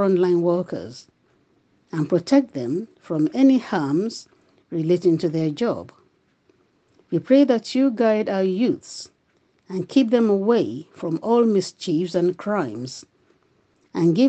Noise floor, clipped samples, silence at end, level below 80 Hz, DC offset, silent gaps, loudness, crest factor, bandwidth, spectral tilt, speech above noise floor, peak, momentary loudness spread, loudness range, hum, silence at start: -64 dBFS; under 0.1%; 0 s; -70 dBFS; under 0.1%; none; -21 LUFS; 16 dB; 8.6 kHz; -7 dB/octave; 44 dB; -4 dBFS; 14 LU; 3 LU; none; 0 s